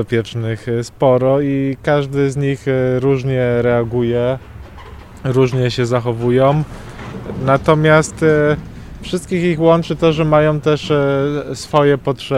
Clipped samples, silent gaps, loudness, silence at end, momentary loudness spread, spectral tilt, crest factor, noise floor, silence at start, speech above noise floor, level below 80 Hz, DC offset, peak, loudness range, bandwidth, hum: under 0.1%; none; -15 LUFS; 0 s; 11 LU; -7 dB/octave; 16 dB; -35 dBFS; 0 s; 20 dB; -38 dBFS; under 0.1%; 0 dBFS; 3 LU; 12.5 kHz; none